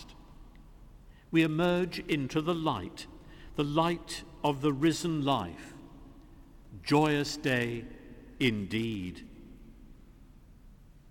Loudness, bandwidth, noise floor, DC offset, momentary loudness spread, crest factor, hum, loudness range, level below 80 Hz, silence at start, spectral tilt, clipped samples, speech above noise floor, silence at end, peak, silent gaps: -31 LUFS; 17.5 kHz; -54 dBFS; under 0.1%; 21 LU; 20 dB; none; 4 LU; -54 dBFS; 0 s; -5.5 dB/octave; under 0.1%; 24 dB; 0.2 s; -12 dBFS; none